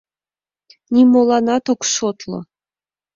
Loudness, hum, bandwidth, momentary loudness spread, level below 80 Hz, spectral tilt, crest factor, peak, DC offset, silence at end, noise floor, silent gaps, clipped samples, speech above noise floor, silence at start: -15 LUFS; none; 7.6 kHz; 17 LU; -60 dBFS; -4 dB/octave; 16 dB; -2 dBFS; under 0.1%; 0.75 s; under -90 dBFS; none; under 0.1%; over 75 dB; 0.9 s